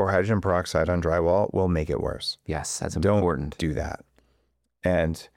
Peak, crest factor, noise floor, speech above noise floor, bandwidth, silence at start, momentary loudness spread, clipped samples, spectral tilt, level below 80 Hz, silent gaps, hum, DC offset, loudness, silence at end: -10 dBFS; 16 dB; -71 dBFS; 46 dB; 16 kHz; 0 s; 8 LU; under 0.1%; -5.5 dB/octave; -40 dBFS; none; none; under 0.1%; -25 LUFS; 0.1 s